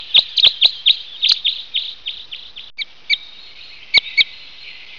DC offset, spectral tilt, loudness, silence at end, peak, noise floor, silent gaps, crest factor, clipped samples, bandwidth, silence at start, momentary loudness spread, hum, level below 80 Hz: 0.9%; 1 dB/octave; -14 LUFS; 0 s; 0 dBFS; -39 dBFS; none; 18 dB; under 0.1%; 7.6 kHz; 0 s; 22 LU; none; -58 dBFS